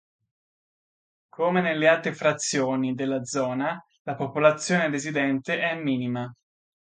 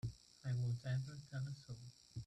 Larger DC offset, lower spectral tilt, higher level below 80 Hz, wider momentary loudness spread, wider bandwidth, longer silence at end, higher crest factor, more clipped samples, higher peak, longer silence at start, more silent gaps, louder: neither; second, -4.5 dB/octave vs -6.5 dB/octave; second, -72 dBFS vs -66 dBFS; second, 10 LU vs 13 LU; about the same, 9.6 kHz vs 9.8 kHz; first, 0.6 s vs 0 s; first, 22 dB vs 12 dB; neither; first, -4 dBFS vs -32 dBFS; first, 1.4 s vs 0.05 s; first, 3.99-4.05 s vs none; first, -25 LUFS vs -46 LUFS